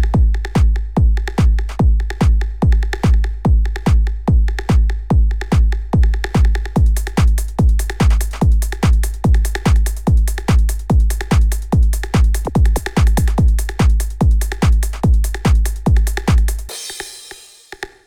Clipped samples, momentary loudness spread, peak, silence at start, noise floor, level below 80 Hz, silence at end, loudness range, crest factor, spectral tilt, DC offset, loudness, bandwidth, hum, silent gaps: under 0.1%; 1 LU; -2 dBFS; 0 s; -39 dBFS; -14 dBFS; 0 s; 1 LU; 12 dB; -6.5 dB/octave; 2%; -16 LUFS; 15 kHz; none; none